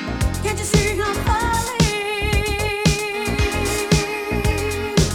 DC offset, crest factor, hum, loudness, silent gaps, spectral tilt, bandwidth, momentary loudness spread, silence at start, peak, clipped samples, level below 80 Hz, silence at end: under 0.1%; 18 dB; none; -20 LUFS; none; -4.5 dB/octave; 19.5 kHz; 4 LU; 0 s; -2 dBFS; under 0.1%; -28 dBFS; 0 s